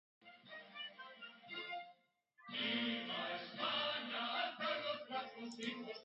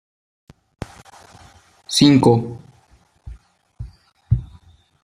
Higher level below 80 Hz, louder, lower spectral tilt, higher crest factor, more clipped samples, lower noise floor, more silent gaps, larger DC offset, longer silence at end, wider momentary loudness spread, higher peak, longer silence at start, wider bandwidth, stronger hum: second, under -90 dBFS vs -40 dBFS; second, -42 LUFS vs -16 LUFS; second, 0 dB/octave vs -5.5 dB/octave; about the same, 18 dB vs 20 dB; neither; first, -73 dBFS vs -56 dBFS; neither; neither; second, 0 s vs 0.6 s; second, 16 LU vs 27 LU; second, -26 dBFS vs -2 dBFS; second, 0.2 s vs 1.9 s; second, 6.8 kHz vs 14.5 kHz; neither